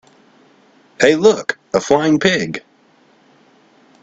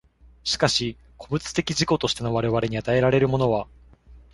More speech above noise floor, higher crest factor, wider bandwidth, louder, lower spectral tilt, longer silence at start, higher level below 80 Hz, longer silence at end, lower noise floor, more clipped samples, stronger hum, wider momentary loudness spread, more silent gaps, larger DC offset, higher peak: first, 39 dB vs 27 dB; about the same, 18 dB vs 20 dB; second, 8 kHz vs 11.5 kHz; first, -15 LUFS vs -23 LUFS; about the same, -4.5 dB/octave vs -5 dB/octave; first, 1 s vs 0.45 s; second, -54 dBFS vs -48 dBFS; first, 1.45 s vs 0.15 s; first, -53 dBFS vs -49 dBFS; neither; neither; about the same, 10 LU vs 10 LU; neither; neither; first, 0 dBFS vs -4 dBFS